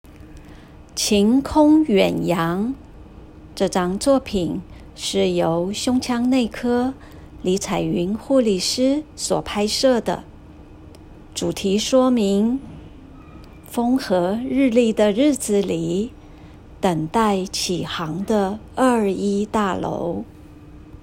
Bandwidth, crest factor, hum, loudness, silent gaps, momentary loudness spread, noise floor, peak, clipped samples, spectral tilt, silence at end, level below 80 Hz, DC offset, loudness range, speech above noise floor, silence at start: 16 kHz; 16 dB; none; -20 LUFS; none; 11 LU; -42 dBFS; -4 dBFS; under 0.1%; -5 dB/octave; 0.05 s; -44 dBFS; under 0.1%; 3 LU; 23 dB; 0.1 s